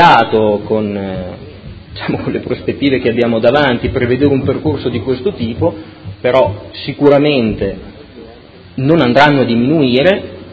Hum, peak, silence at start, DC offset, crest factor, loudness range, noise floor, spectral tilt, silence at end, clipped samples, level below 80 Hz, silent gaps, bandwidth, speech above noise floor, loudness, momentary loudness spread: none; 0 dBFS; 0 s; under 0.1%; 14 dB; 3 LU; -37 dBFS; -8 dB/octave; 0 s; 0.3%; -36 dBFS; none; 8 kHz; 24 dB; -13 LUFS; 16 LU